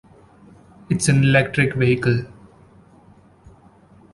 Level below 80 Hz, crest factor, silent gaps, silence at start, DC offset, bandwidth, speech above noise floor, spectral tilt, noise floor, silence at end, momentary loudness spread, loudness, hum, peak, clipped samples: -48 dBFS; 18 dB; none; 0.9 s; under 0.1%; 11.5 kHz; 33 dB; -5.5 dB/octave; -50 dBFS; 1.85 s; 10 LU; -18 LUFS; none; -4 dBFS; under 0.1%